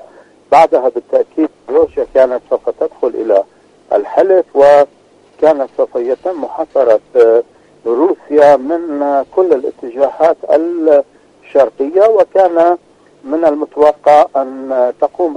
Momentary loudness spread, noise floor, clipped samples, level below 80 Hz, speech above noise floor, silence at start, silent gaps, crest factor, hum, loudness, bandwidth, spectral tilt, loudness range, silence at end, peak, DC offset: 9 LU; -41 dBFS; 0.3%; -54 dBFS; 30 dB; 0.5 s; none; 12 dB; none; -12 LUFS; 9.2 kHz; -6 dB/octave; 2 LU; 0 s; 0 dBFS; under 0.1%